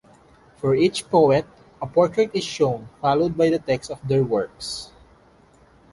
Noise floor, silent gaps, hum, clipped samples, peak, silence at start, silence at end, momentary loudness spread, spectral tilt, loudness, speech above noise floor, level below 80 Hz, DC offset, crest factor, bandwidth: -54 dBFS; none; none; under 0.1%; -4 dBFS; 0.65 s; 1.05 s; 12 LU; -6 dB/octave; -21 LUFS; 33 dB; -54 dBFS; under 0.1%; 18 dB; 11.5 kHz